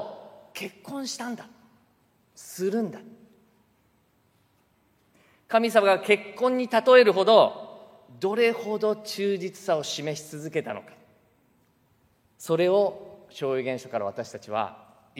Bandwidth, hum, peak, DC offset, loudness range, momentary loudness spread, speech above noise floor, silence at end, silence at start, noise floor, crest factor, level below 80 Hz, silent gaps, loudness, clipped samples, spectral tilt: 16 kHz; none; -4 dBFS; under 0.1%; 15 LU; 22 LU; 42 dB; 0.45 s; 0 s; -66 dBFS; 22 dB; -78 dBFS; none; -24 LUFS; under 0.1%; -4.5 dB/octave